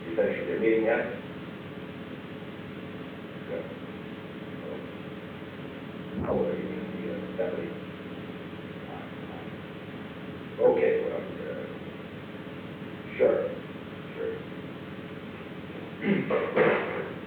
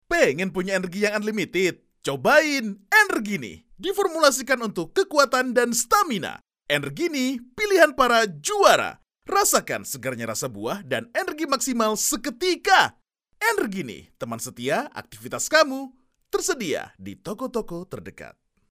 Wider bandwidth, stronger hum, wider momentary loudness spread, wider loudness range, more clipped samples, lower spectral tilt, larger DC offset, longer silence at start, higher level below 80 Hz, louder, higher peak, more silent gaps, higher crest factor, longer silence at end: first, 19.5 kHz vs 16 kHz; neither; about the same, 15 LU vs 16 LU; first, 9 LU vs 5 LU; neither; first, -8 dB/octave vs -2.5 dB/octave; neither; about the same, 0 s vs 0.1 s; second, -62 dBFS vs -56 dBFS; second, -32 LUFS vs -22 LUFS; second, -10 dBFS vs -2 dBFS; neither; about the same, 20 dB vs 20 dB; second, 0 s vs 0.45 s